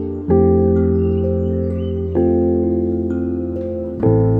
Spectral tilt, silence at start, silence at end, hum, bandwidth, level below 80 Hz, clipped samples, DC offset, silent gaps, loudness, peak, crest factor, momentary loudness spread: -12.5 dB/octave; 0 s; 0 s; none; 3.2 kHz; -32 dBFS; under 0.1%; under 0.1%; none; -17 LUFS; -2 dBFS; 14 dB; 8 LU